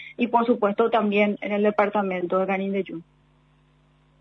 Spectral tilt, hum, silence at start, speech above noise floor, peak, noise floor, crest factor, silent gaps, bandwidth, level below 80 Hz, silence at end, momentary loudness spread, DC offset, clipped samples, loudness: -8.5 dB/octave; none; 0 s; 37 dB; -6 dBFS; -60 dBFS; 18 dB; none; 5.8 kHz; -68 dBFS; 1.2 s; 7 LU; under 0.1%; under 0.1%; -23 LUFS